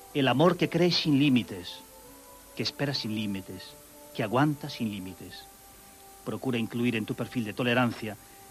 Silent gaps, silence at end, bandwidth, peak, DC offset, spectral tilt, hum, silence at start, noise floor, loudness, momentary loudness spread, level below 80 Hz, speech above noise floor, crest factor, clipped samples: none; 0 s; 13.5 kHz; -8 dBFS; under 0.1%; -5.5 dB/octave; none; 0 s; -52 dBFS; -28 LUFS; 22 LU; -62 dBFS; 23 dB; 20 dB; under 0.1%